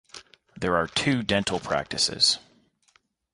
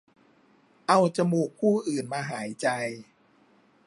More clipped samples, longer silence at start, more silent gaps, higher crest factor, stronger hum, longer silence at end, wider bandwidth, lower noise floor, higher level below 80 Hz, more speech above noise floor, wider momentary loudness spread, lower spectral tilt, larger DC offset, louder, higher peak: neither; second, 0.15 s vs 0.9 s; neither; about the same, 20 dB vs 22 dB; neither; about the same, 0.95 s vs 0.85 s; about the same, 11.5 kHz vs 11.5 kHz; first, -66 dBFS vs -62 dBFS; first, -52 dBFS vs -76 dBFS; first, 41 dB vs 36 dB; about the same, 11 LU vs 12 LU; second, -3 dB/octave vs -5.5 dB/octave; neither; first, -24 LUFS vs -27 LUFS; about the same, -8 dBFS vs -6 dBFS